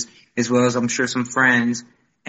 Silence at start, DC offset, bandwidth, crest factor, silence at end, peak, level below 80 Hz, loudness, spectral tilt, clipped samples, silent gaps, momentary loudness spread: 0 s; under 0.1%; 8.2 kHz; 16 dB; 0.45 s; -4 dBFS; -64 dBFS; -19 LUFS; -4 dB/octave; under 0.1%; none; 10 LU